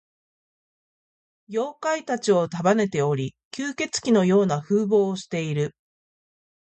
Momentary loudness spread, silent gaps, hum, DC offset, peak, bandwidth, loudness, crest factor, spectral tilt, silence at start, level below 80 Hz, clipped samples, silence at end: 10 LU; 3.45-3.51 s; none; under 0.1%; -8 dBFS; 8.8 kHz; -23 LUFS; 18 dB; -5.5 dB/octave; 1.5 s; -66 dBFS; under 0.1%; 1.05 s